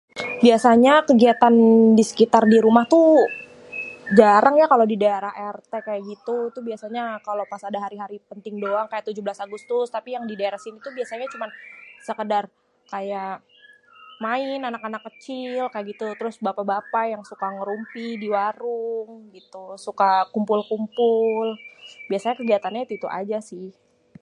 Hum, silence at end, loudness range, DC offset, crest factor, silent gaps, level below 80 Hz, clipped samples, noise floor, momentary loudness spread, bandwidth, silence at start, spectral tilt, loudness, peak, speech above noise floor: none; 0.5 s; 14 LU; under 0.1%; 20 dB; none; -68 dBFS; under 0.1%; -51 dBFS; 20 LU; 11.5 kHz; 0.15 s; -5.5 dB/octave; -20 LUFS; 0 dBFS; 31 dB